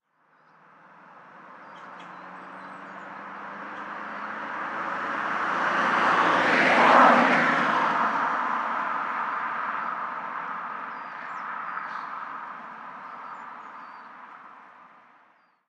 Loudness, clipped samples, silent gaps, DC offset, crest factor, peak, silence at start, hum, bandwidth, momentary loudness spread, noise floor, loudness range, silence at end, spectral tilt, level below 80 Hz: -24 LUFS; under 0.1%; none; under 0.1%; 24 dB; -4 dBFS; 1.05 s; none; 10.5 kHz; 23 LU; -62 dBFS; 21 LU; 0.8 s; -4.5 dB/octave; -84 dBFS